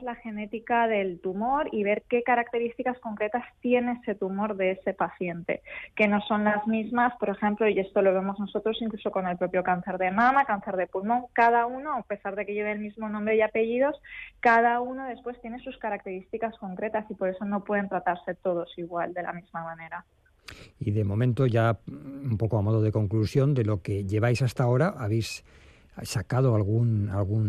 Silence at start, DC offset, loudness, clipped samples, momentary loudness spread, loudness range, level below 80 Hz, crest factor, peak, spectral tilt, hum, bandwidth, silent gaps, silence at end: 0 s; under 0.1%; -27 LUFS; under 0.1%; 12 LU; 5 LU; -58 dBFS; 16 dB; -10 dBFS; -7.5 dB/octave; none; 13 kHz; none; 0 s